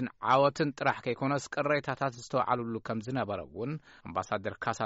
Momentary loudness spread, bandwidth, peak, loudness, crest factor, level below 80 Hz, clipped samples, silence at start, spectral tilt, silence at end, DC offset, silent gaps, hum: 11 LU; 8 kHz; -14 dBFS; -31 LUFS; 18 dB; -66 dBFS; under 0.1%; 0 s; -4.5 dB/octave; 0 s; under 0.1%; none; none